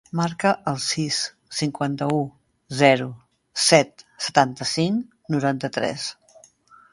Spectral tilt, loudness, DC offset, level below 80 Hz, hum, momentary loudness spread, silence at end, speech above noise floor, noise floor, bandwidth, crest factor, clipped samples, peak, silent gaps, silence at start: -4 dB/octave; -22 LUFS; under 0.1%; -62 dBFS; none; 13 LU; 0.8 s; 31 dB; -53 dBFS; 11.5 kHz; 22 dB; under 0.1%; 0 dBFS; none; 0.15 s